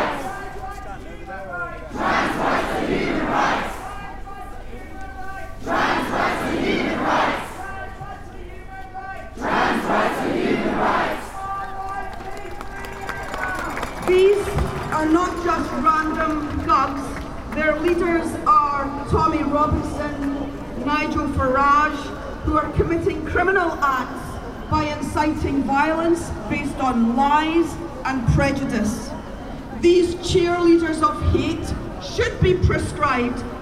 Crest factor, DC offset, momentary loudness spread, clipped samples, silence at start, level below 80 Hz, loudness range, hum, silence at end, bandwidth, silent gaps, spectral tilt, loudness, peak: 16 dB; under 0.1%; 16 LU; under 0.1%; 0 s; -34 dBFS; 5 LU; none; 0 s; 15 kHz; none; -6 dB/octave; -21 LUFS; -4 dBFS